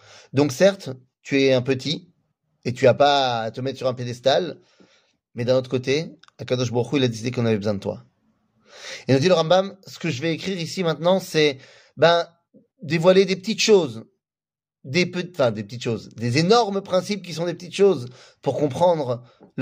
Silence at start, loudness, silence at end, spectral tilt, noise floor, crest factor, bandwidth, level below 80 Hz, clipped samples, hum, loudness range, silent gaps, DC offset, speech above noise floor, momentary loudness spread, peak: 0.35 s; -21 LUFS; 0 s; -5.5 dB/octave; under -90 dBFS; 18 dB; 15.5 kHz; -64 dBFS; under 0.1%; none; 4 LU; none; under 0.1%; over 69 dB; 15 LU; -4 dBFS